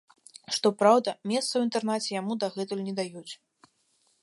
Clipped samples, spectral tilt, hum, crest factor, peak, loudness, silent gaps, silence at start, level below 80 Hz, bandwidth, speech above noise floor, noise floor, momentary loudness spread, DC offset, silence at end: under 0.1%; -4 dB/octave; none; 22 dB; -8 dBFS; -27 LUFS; none; 0.5 s; -82 dBFS; 11.5 kHz; 43 dB; -70 dBFS; 19 LU; under 0.1%; 0.9 s